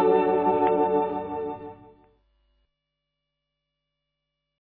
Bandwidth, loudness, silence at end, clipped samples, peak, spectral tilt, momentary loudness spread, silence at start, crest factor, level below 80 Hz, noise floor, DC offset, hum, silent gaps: 4.2 kHz; -24 LUFS; 2.85 s; under 0.1%; -10 dBFS; -10.5 dB/octave; 15 LU; 0 s; 18 dB; -62 dBFS; -82 dBFS; under 0.1%; 50 Hz at -70 dBFS; none